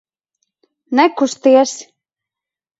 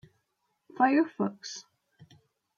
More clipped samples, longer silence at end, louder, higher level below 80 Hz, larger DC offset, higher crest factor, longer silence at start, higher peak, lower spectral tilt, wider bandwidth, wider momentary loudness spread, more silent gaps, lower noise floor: neither; about the same, 0.95 s vs 0.95 s; first, -14 LUFS vs -27 LUFS; first, -70 dBFS vs -80 dBFS; neither; about the same, 18 dB vs 22 dB; about the same, 0.9 s vs 0.8 s; first, 0 dBFS vs -10 dBFS; second, -2.5 dB/octave vs -5 dB/octave; about the same, 8 kHz vs 7.6 kHz; second, 8 LU vs 17 LU; neither; first, -86 dBFS vs -78 dBFS